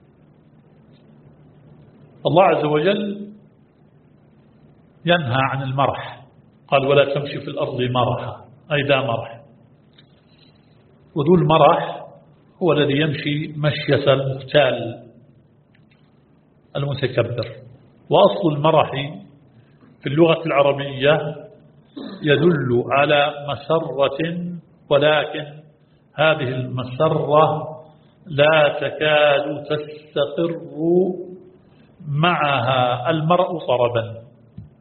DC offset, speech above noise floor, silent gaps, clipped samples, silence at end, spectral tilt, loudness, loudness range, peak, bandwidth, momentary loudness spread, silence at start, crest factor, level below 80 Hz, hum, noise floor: under 0.1%; 36 dB; none; under 0.1%; 0.15 s; -4.5 dB/octave; -19 LUFS; 5 LU; 0 dBFS; 4.5 kHz; 16 LU; 2.25 s; 20 dB; -56 dBFS; none; -55 dBFS